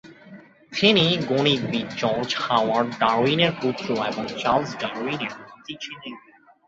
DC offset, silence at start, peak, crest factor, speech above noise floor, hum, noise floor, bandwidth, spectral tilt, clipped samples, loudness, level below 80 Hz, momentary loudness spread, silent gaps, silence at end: under 0.1%; 0.05 s; -2 dBFS; 22 dB; 24 dB; none; -47 dBFS; 8 kHz; -5 dB/octave; under 0.1%; -22 LUFS; -60 dBFS; 15 LU; none; 0.5 s